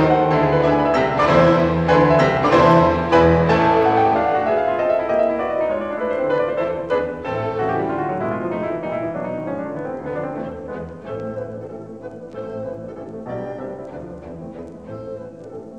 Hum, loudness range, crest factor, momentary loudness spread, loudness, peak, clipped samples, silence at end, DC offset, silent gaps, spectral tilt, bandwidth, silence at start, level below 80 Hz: none; 16 LU; 18 dB; 19 LU; -18 LUFS; 0 dBFS; under 0.1%; 0 s; 0.2%; none; -7.5 dB/octave; 8.4 kHz; 0 s; -42 dBFS